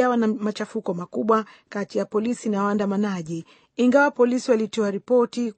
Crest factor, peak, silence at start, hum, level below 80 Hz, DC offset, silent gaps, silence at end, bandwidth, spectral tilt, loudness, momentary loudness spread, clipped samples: 18 dB; -6 dBFS; 0 s; none; -70 dBFS; under 0.1%; none; 0.05 s; 8.8 kHz; -6 dB/octave; -23 LUFS; 11 LU; under 0.1%